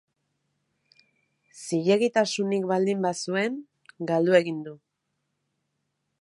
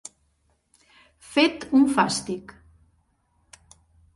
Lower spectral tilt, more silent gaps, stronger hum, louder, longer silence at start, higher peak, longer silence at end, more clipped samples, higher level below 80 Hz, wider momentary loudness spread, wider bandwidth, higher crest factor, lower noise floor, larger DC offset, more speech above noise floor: first, -5 dB/octave vs -3.5 dB/octave; neither; neither; second, -25 LUFS vs -22 LUFS; first, 1.55 s vs 1.3 s; about the same, -6 dBFS vs -4 dBFS; second, 1.45 s vs 1.75 s; neither; second, -78 dBFS vs -60 dBFS; about the same, 15 LU vs 15 LU; about the same, 11.5 kHz vs 11.5 kHz; about the same, 22 dB vs 22 dB; first, -79 dBFS vs -68 dBFS; neither; first, 55 dB vs 47 dB